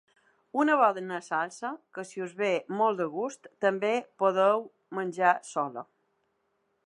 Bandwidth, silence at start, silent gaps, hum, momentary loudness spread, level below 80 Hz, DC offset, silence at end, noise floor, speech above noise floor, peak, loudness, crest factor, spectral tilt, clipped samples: 11 kHz; 0.55 s; none; none; 13 LU; -86 dBFS; under 0.1%; 1.05 s; -75 dBFS; 47 dB; -8 dBFS; -28 LUFS; 20 dB; -5 dB/octave; under 0.1%